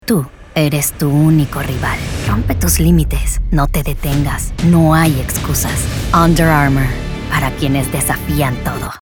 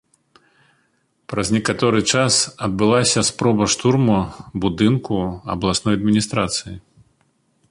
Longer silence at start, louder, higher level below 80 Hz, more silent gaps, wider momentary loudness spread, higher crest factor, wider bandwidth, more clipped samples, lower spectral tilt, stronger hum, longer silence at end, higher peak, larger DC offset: second, 0.05 s vs 1.3 s; first, -15 LUFS vs -18 LUFS; first, -22 dBFS vs -44 dBFS; neither; about the same, 8 LU vs 9 LU; about the same, 14 dB vs 16 dB; first, over 20 kHz vs 11.5 kHz; neither; about the same, -5.5 dB/octave vs -4.5 dB/octave; neither; second, 0.05 s vs 0.9 s; about the same, 0 dBFS vs -2 dBFS; neither